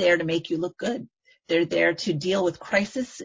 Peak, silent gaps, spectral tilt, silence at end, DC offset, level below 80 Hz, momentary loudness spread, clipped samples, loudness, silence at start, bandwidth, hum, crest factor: -8 dBFS; none; -5 dB/octave; 0 s; under 0.1%; -62 dBFS; 9 LU; under 0.1%; -25 LUFS; 0 s; 8 kHz; none; 18 dB